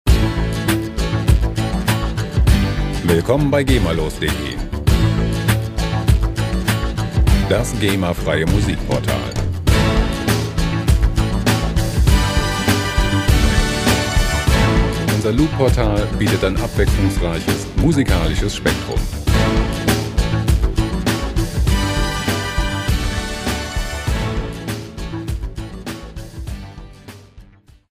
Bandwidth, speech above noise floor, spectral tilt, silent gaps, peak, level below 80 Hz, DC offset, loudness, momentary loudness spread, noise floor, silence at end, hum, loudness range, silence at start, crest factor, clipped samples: 16 kHz; 28 dB; -5.5 dB/octave; none; 0 dBFS; -22 dBFS; under 0.1%; -18 LUFS; 9 LU; -45 dBFS; 0.5 s; none; 6 LU; 0.05 s; 16 dB; under 0.1%